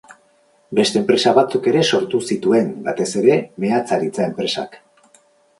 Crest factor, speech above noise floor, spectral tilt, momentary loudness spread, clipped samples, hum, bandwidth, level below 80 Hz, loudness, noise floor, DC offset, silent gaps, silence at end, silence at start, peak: 18 dB; 40 dB; -4.5 dB/octave; 8 LU; under 0.1%; none; 11.5 kHz; -62 dBFS; -18 LUFS; -57 dBFS; under 0.1%; none; 0.8 s; 0.1 s; -2 dBFS